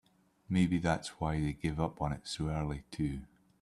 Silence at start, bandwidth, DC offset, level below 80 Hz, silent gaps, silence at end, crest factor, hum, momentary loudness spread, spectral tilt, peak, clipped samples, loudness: 0.5 s; 12 kHz; under 0.1%; -50 dBFS; none; 0.35 s; 18 dB; none; 7 LU; -6.5 dB/octave; -16 dBFS; under 0.1%; -35 LUFS